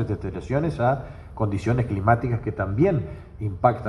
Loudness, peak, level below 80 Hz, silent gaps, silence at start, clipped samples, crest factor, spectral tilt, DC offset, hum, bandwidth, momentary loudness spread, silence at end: -24 LUFS; -4 dBFS; -42 dBFS; none; 0 s; under 0.1%; 20 dB; -9 dB/octave; under 0.1%; none; 10 kHz; 10 LU; 0 s